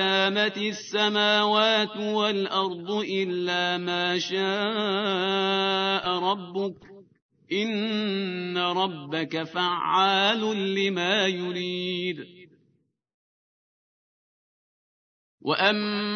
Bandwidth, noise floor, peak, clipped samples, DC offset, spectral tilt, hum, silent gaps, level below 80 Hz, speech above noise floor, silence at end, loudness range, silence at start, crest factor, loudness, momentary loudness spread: 6.6 kHz; -70 dBFS; -8 dBFS; under 0.1%; under 0.1%; -4.5 dB/octave; none; 7.22-7.29 s, 13.14-15.38 s; -78 dBFS; 44 dB; 0 s; 7 LU; 0 s; 20 dB; -25 LUFS; 9 LU